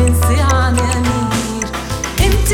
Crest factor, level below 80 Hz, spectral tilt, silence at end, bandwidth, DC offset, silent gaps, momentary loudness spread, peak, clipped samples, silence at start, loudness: 14 dB; -20 dBFS; -4.5 dB/octave; 0 s; 17.5 kHz; under 0.1%; none; 8 LU; 0 dBFS; under 0.1%; 0 s; -15 LUFS